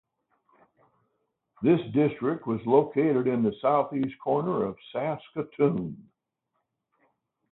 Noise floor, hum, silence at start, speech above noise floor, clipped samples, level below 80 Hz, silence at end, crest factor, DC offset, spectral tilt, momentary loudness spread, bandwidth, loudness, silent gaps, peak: -80 dBFS; none; 1.6 s; 54 dB; under 0.1%; -66 dBFS; 1.5 s; 20 dB; under 0.1%; -12 dB/octave; 9 LU; 4.1 kHz; -27 LUFS; none; -8 dBFS